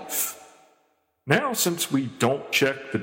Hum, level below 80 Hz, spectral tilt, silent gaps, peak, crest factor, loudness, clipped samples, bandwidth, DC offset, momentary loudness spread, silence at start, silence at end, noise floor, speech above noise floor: none; -70 dBFS; -3.5 dB/octave; none; -6 dBFS; 20 dB; -24 LUFS; under 0.1%; 17 kHz; under 0.1%; 7 LU; 0 s; 0 s; -68 dBFS; 44 dB